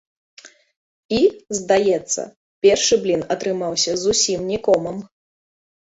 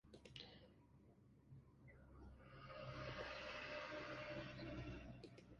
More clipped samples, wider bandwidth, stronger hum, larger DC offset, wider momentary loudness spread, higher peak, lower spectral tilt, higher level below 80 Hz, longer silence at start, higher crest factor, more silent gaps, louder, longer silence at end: neither; second, 8 kHz vs 11 kHz; neither; neither; second, 8 LU vs 16 LU; first, -2 dBFS vs -36 dBFS; second, -3 dB/octave vs -5.5 dB/octave; first, -54 dBFS vs -68 dBFS; first, 0.45 s vs 0.05 s; about the same, 18 dB vs 18 dB; first, 0.76-1.09 s, 2.36-2.62 s vs none; first, -19 LUFS vs -54 LUFS; first, 0.8 s vs 0 s